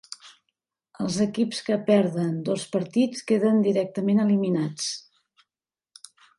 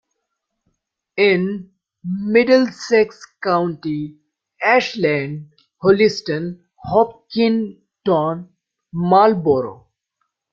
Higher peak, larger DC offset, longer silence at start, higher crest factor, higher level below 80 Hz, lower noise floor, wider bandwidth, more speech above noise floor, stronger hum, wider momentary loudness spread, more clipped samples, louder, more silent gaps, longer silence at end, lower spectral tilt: second, -8 dBFS vs -2 dBFS; neither; second, 0.1 s vs 1.15 s; about the same, 18 dB vs 18 dB; second, -70 dBFS vs -58 dBFS; first, under -90 dBFS vs -76 dBFS; first, 11.5 kHz vs 7.6 kHz; first, over 67 dB vs 59 dB; neither; second, 9 LU vs 17 LU; neither; second, -24 LUFS vs -18 LUFS; neither; first, 1.4 s vs 0.8 s; about the same, -6 dB/octave vs -6.5 dB/octave